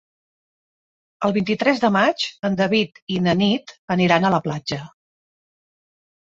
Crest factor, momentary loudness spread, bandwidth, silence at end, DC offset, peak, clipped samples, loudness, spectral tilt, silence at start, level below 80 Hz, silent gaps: 20 dB; 9 LU; 7.8 kHz; 1.35 s; under 0.1%; -2 dBFS; under 0.1%; -20 LUFS; -6 dB/octave; 1.2 s; -58 dBFS; 3.02-3.07 s, 3.78-3.88 s